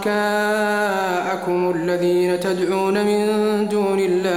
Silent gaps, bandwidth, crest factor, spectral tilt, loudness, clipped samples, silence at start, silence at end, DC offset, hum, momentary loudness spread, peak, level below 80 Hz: none; 16 kHz; 12 dB; -5.5 dB/octave; -19 LUFS; under 0.1%; 0 s; 0 s; 0.2%; none; 2 LU; -6 dBFS; -64 dBFS